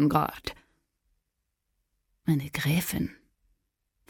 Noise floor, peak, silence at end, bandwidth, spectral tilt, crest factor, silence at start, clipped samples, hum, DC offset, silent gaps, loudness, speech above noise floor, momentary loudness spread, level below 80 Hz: -81 dBFS; -10 dBFS; 0.95 s; 17.5 kHz; -5.5 dB/octave; 22 dB; 0 s; under 0.1%; none; under 0.1%; none; -29 LUFS; 54 dB; 11 LU; -54 dBFS